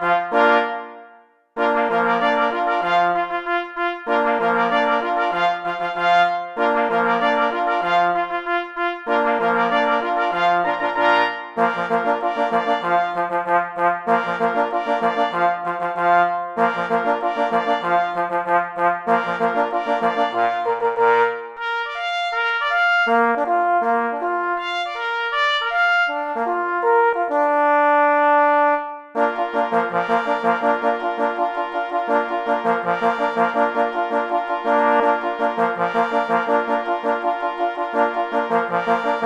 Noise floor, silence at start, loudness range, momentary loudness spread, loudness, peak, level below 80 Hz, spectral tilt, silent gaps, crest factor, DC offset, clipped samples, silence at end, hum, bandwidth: -50 dBFS; 0 s; 3 LU; 6 LU; -19 LUFS; -4 dBFS; -64 dBFS; -5 dB/octave; none; 16 dB; under 0.1%; under 0.1%; 0 s; none; 8.8 kHz